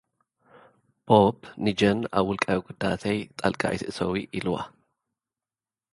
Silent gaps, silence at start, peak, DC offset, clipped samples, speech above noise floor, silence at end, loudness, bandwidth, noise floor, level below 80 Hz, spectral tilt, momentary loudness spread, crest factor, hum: none; 1.05 s; -4 dBFS; under 0.1%; under 0.1%; over 65 dB; 1.25 s; -26 LUFS; 11.5 kHz; under -90 dBFS; -54 dBFS; -6 dB/octave; 10 LU; 24 dB; none